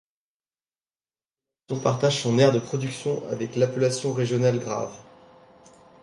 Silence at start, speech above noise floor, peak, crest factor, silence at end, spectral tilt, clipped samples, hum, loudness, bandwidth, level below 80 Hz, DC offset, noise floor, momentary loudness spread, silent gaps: 1.7 s; over 67 dB; -6 dBFS; 20 dB; 1 s; -5.5 dB/octave; under 0.1%; none; -24 LUFS; 11.5 kHz; -66 dBFS; under 0.1%; under -90 dBFS; 10 LU; none